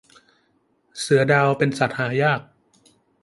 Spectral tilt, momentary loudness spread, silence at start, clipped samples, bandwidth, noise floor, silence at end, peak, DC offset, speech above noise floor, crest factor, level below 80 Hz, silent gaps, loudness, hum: -5.5 dB/octave; 11 LU; 0.95 s; under 0.1%; 11.5 kHz; -65 dBFS; 0.8 s; -2 dBFS; under 0.1%; 46 dB; 20 dB; -64 dBFS; none; -20 LUFS; none